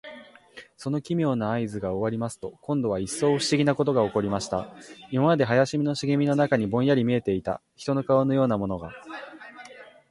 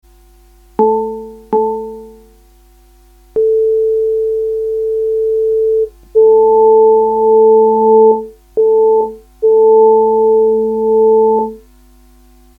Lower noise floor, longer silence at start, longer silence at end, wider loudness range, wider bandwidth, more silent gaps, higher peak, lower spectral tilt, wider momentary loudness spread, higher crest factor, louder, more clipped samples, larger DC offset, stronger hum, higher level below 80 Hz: first, -49 dBFS vs -45 dBFS; second, 0.05 s vs 0.8 s; second, 0.25 s vs 1 s; second, 3 LU vs 8 LU; first, 11.5 kHz vs 1.4 kHz; neither; second, -8 dBFS vs 0 dBFS; second, -6 dB/octave vs -9 dB/octave; first, 17 LU vs 10 LU; first, 18 dB vs 12 dB; second, -25 LUFS vs -11 LUFS; neither; neither; neither; second, -56 dBFS vs -46 dBFS